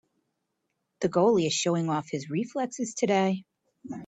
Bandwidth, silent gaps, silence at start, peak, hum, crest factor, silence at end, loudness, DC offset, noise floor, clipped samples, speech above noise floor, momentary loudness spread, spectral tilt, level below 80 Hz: 9.2 kHz; none; 1 s; -12 dBFS; none; 18 dB; 0 s; -27 LUFS; under 0.1%; -80 dBFS; under 0.1%; 54 dB; 9 LU; -5 dB/octave; -72 dBFS